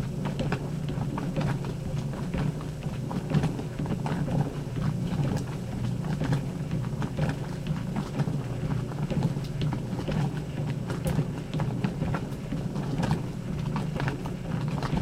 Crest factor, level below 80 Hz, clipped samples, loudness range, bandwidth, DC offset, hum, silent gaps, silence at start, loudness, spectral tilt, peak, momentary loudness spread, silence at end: 18 dB; -44 dBFS; under 0.1%; 1 LU; 14.5 kHz; under 0.1%; none; none; 0 s; -31 LUFS; -7.5 dB/octave; -12 dBFS; 4 LU; 0 s